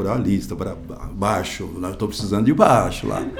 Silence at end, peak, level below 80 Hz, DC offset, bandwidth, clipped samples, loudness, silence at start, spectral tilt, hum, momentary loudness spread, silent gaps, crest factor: 0 s; 0 dBFS; -38 dBFS; under 0.1%; 19 kHz; under 0.1%; -21 LUFS; 0 s; -6 dB/octave; none; 14 LU; none; 20 dB